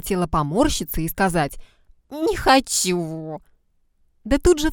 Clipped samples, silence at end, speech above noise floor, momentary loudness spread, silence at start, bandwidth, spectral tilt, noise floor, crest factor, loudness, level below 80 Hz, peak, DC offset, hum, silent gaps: under 0.1%; 0 s; 42 dB; 17 LU; 0.05 s; 19 kHz; -4 dB/octave; -62 dBFS; 20 dB; -21 LUFS; -34 dBFS; -2 dBFS; under 0.1%; none; none